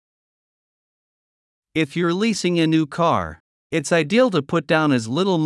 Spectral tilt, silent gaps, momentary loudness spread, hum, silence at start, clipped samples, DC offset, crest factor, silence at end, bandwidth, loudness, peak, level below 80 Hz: -5.5 dB/octave; 3.40-3.70 s; 7 LU; none; 1.75 s; under 0.1%; under 0.1%; 16 dB; 0 s; 12 kHz; -20 LUFS; -4 dBFS; -58 dBFS